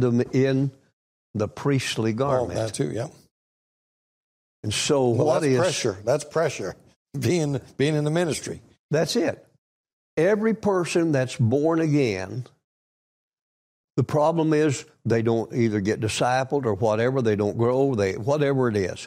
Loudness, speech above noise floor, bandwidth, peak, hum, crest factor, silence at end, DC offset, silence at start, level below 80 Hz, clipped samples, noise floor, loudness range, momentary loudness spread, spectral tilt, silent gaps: -23 LUFS; over 67 dB; 15.5 kHz; -10 dBFS; none; 14 dB; 0 s; under 0.1%; 0 s; -60 dBFS; under 0.1%; under -90 dBFS; 4 LU; 9 LU; -6 dB/octave; 0.93-1.34 s, 3.31-4.63 s, 6.96-7.06 s, 8.79-8.89 s, 9.58-9.84 s, 9.93-10.17 s, 12.64-13.88 s